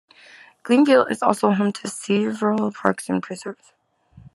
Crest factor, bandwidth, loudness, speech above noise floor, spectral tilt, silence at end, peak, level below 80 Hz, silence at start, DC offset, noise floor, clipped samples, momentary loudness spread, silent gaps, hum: 20 dB; 13 kHz; -20 LUFS; 31 dB; -5.5 dB/octave; 0.05 s; 0 dBFS; -68 dBFS; 0.65 s; under 0.1%; -51 dBFS; under 0.1%; 16 LU; none; none